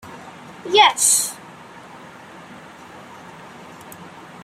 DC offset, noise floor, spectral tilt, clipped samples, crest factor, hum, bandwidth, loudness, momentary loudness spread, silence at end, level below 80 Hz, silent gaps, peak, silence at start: under 0.1%; -41 dBFS; 0 dB/octave; under 0.1%; 22 dB; none; 16 kHz; -15 LUFS; 26 LU; 0 s; -66 dBFS; none; -2 dBFS; 0.05 s